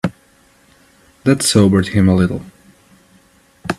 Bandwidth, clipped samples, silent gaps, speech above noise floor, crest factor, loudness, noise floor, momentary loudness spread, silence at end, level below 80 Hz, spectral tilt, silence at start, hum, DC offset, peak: 13.5 kHz; under 0.1%; none; 39 dB; 18 dB; -14 LUFS; -52 dBFS; 14 LU; 0.05 s; -48 dBFS; -5.5 dB/octave; 0.05 s; none; under 0.1%; 0 dBFS